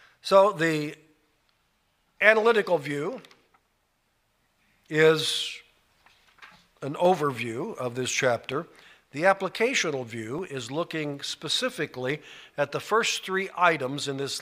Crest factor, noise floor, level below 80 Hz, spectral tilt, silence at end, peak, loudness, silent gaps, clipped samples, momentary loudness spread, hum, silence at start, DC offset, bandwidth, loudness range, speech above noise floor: 26 dB; -72 dBFS; -72 dBFS; -3.5 dB/octave; 0 s; -2 dBFS; -26 LUFS; none; under 0.1%; 14 LU; none; 0.25 s; under 0.1%; 16 kHz; 3 LU; 46 dB